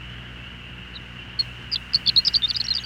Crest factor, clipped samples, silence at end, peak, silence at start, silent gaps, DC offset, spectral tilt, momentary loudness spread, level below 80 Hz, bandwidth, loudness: 18 dB; under 0.1%; 0 s; -8 dBFS; 0 s; none; under 0.1%; -2 dB/octave; 21 LU; -46 dBFS; 16.5 kHz; -20 LUFS